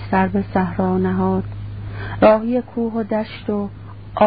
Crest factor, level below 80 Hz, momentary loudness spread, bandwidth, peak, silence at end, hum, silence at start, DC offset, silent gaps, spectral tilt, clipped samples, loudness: 18 dB; -40 dBFS; 16 LU; 5 kHz; 0 dBFS; 0 s; none; 0 s; 0.4%; none; -12.5 dB/octave; under 0.1%; -19 LUFS